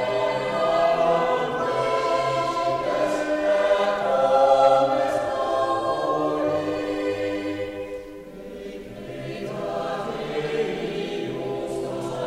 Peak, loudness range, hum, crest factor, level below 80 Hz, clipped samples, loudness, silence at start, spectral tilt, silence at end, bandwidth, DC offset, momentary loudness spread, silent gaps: -6 dBFS; 10 LU; none; 18 dB; -54 dBFS; under 0.1%; -23 LUFS; 0 s; -5 dB/octave; 0 s; 14.5 kHz; under 0.1%; 14 LU; none